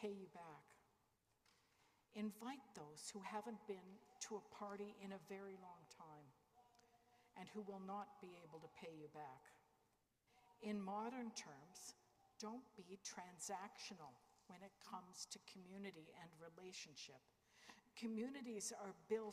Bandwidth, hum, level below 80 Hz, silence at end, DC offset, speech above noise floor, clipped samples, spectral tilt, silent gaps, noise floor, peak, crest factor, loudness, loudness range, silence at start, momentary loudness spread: 15.5 kHz; none; under -90 dBFS; 0 s; under 0.1%; 30 dB; under 0.1%; -3.5 dB/octave; none; -84 dBFS; -32 dBFS; 22 dB; -54 LUFS; 5 LU; 0 s; 14 LU